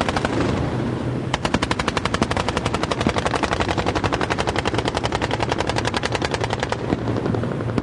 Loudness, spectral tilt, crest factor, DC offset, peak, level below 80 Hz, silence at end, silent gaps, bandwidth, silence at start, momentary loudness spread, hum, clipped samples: -22 LUFS; -5 dB/octave; 18 dB; under 0.1%; -4 dBFS; -36 dBFS; 0 s; none; 11.5 kHz; 0 s; 3 LU; none; under 0.1%